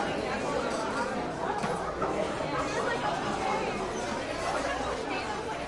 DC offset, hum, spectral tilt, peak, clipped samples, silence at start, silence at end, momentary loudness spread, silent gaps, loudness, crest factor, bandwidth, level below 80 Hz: under 0.1%; none; -4.5 dB/octave; -18 dBFS; under 0.1%; 0 s; 0 s; 3 LU; none; -31 LUFS; 14 dB; 11.5 kHz; -50 dBFS